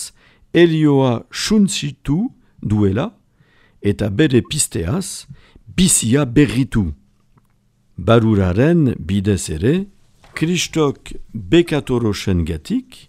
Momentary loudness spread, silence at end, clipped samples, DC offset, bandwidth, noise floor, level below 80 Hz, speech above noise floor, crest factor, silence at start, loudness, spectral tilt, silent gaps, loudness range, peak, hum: 13 LU; 0.15 s; under 0.1%; under 0.1%; 16 kHz; -58 dBFS; -38 dBFS; 42 dB; 18 dB; 0 s; -17 LUFS; -5 dB/octave; none; 3 LU; 0 dBFS; none